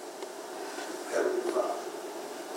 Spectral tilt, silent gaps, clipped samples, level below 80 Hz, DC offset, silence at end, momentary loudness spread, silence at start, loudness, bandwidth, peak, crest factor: -2 dB/octave; none; under 0.1%; under -90 dBFS; under 0.1%; 0 s; 11 LU; 0 s; -34 LUFS; 16 kHz; -16 dBFS; 18 dB